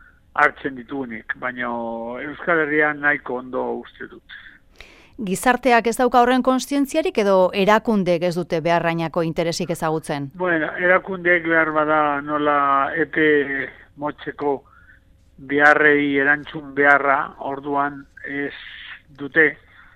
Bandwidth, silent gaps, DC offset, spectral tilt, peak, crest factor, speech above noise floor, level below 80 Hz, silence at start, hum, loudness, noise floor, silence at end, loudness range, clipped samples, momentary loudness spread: 16 kHz; none; under 0.1%; -5 dB/octave; 0 dBFS; 20 dB; 32 dB; -52 dBFS; 0.35 s; none; -19 LUFS; -51 dBFS; 0.4 s; 5 LU; under 0.1%; 14 LU